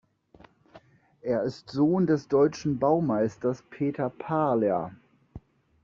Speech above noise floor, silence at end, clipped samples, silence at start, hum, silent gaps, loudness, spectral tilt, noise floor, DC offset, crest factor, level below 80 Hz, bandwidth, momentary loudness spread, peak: 31 dB; 0.45 s; under 0.1%; 0.75 s; none; none; -27 LUFS; -7.5 dB/octave; -57 dBFS; under 0.1%; 18 dB; -62 dBFS; 7.4 kHz; 8 LU; -10 dBFS